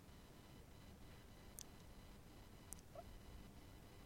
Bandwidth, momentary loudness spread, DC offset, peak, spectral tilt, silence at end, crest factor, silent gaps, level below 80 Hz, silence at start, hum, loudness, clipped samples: 16.5 kHz; 5 LU; under 0.1%; -28 dBFS; -4 dB/octave; 0 s; 32 dB; none; -64 dBFS; 0 s; none; -61 LUFS; under 0.1%